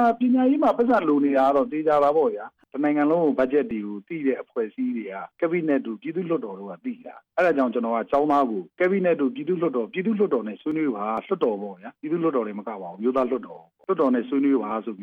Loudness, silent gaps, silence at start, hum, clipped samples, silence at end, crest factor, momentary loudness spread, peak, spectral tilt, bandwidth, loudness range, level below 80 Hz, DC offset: -23 LUFS; none; 0 s; none; under 0.1%; 0 s; 12 dB; 13 LU; -10 dBFS; -8.5 dB/octave; 6 kHz; 6 LU; -66 dBFS; under 0.1%